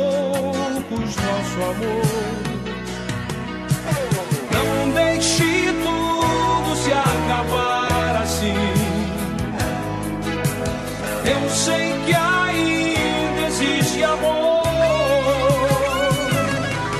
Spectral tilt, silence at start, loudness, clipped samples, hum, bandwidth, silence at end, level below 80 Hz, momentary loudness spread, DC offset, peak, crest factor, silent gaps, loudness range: -4.5 dB/octave; 0 s; -20 LUFS; under 0.1%; none; 13.5 kHz; 0 s; -38 dBFS; 7 LU; under 0.1%; -6 dBFS; 14 dB; none; 5 LU